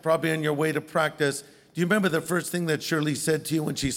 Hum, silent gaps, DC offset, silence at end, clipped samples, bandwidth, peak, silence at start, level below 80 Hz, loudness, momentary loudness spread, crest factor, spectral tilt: none; none; under 0.1%; 0 s; under 0.1%; 17 kHz; -10 dBFS; 0.05 s; -54 dBFS; -26 LUFS; 4 LU; 16 dB; -4.5 dB/octave